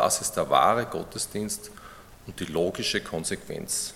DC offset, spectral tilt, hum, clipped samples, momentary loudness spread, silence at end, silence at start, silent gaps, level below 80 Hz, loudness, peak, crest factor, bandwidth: under 0.1%; -3 dB/octave; none; under 0.1%; 22 LU; 0 s; 0 s; none; -54 dBFS; -27 LUFS; -6 dBFS; 22 dB; 17.5 kHz